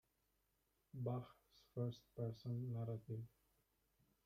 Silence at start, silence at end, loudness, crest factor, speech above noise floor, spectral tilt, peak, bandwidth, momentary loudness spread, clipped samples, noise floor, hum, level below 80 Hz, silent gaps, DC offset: 0.95 s; 1 s; -48 LUFS; 18 dB; 38 dB; -9 dB/octave; -32 dBFS; 14.5 kHz; 11 LU; under 0.1%; -85 dBFS; none; -78 dBFS; none; under 0.1%